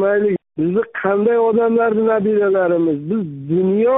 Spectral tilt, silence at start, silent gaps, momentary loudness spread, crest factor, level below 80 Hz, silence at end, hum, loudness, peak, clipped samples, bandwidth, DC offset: -4 dB/octave; 0 s; none; 6 LU; 12 dB; -58 dBFS; 0 s; none; -17 LUFS; -4 dBFS; under 0.1%; 3.9 kHz; under 0.1%